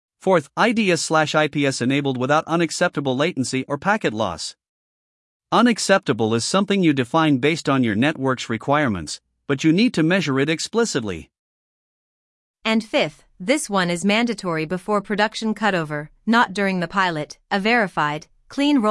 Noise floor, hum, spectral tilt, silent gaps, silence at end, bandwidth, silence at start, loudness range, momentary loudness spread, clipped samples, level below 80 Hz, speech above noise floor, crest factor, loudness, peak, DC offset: under -90 dBFS; none; -4.5 dB/octave; 4.69-5.40 s, 11.39-12.54 s; 0 s; 12 kHz; 0.25 s; 4 LU; 8 LU; under 0.1%; -58 dBFS; over 70 dB; 18 dB; -20 LUFS; -2 dBFS; under 0.1%